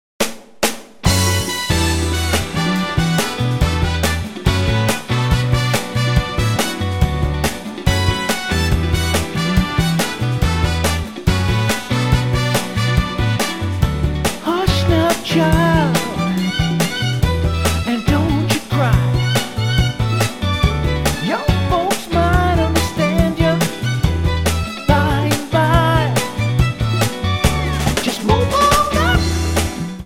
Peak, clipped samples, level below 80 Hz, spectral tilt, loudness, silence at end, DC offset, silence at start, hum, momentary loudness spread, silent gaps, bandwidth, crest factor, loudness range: 0 dBFS; under 0.1%; -26 dBFS; -5 dB/octave; -17 LUFS; 0 s; 0.6%; 0.2 s; none; 4 LU; none; 17 kHz; 16 dB; 2 LU